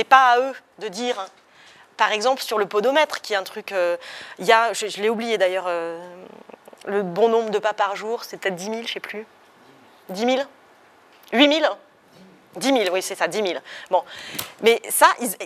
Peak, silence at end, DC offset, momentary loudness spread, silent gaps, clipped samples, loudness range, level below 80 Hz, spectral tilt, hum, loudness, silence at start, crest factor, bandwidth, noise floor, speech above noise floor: 0 dBFS; 0 s; under 0.1%; 16 LU; none; under 0.1%; 4 LU; -76 dBFS; -2.5 dB/octave; none; -21 LUFS; 0 s; 22 dB; 15.5 kHz; -52 dBFS; 31 dB